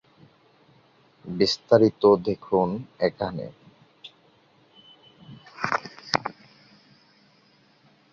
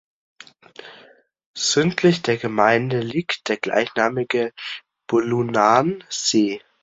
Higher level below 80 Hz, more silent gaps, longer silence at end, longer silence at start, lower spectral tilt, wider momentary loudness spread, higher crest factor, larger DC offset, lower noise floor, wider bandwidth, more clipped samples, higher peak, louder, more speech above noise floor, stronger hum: about the same, -60 dBFS vs -62 dBFS; second, none vs 1.46-1.54 s; first, 1.8 s vs 0.25 s; first, 1.25 s vs 0.85 s; first, -5.5 dB/octave vs -4 dB/octave; first, 27 LU vs 13 LU; first, 26 dB vs 20 dB; neither; first, -60 dBFS vs -52 dBFS; about the same, 7.6 kHz vs 8 kHz; neither; about the same, -2 dBFS vs -2 dBFS; second, -24 LUFS vs -20 LUFS; first, 38 dB vs 32 dB; neither